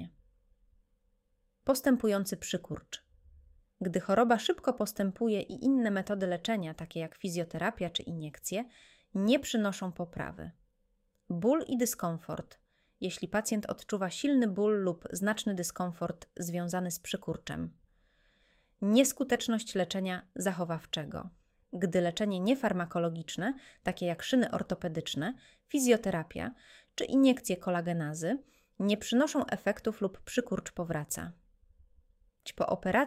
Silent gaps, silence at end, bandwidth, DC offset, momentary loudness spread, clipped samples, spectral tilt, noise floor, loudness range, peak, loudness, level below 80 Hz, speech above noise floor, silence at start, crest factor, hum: none; 0 s; 16 kHz; under 0.1%; 12 LU; under 0.1%; -5 dB/octave; -75 dBFS; 4 LU; -10 dBFS; -32 LUFS; -62 dBFS; 43 dB; 0 s; 22 dB; none